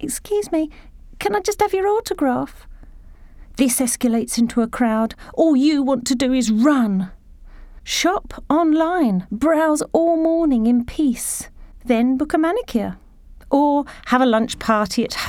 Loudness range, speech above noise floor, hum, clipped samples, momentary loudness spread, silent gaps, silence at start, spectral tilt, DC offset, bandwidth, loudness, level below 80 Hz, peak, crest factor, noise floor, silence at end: 3 LU; 23 dB; none; under 0.1%; 8 LU; none; 0 s; -4.5 dB/octave; under 0.1%; 17 kHz; -19 LUFS; -42 dBFS; -4 dBFS; 14 dB; -41 dBFS; 0 s